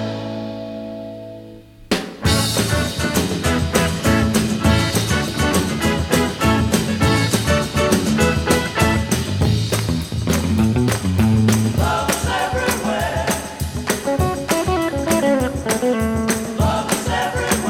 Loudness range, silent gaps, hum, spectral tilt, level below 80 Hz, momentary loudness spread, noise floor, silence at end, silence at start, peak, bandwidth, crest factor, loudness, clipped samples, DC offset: 3 LU; none; none; -5 dB/octave; -32 dBFS; 7 LU; -40 dBFS; 0 s; 0 s; -2 dBFS; 17.5 kHz; 16 dB; -18 LUFS; under 0.1%; under 0.1%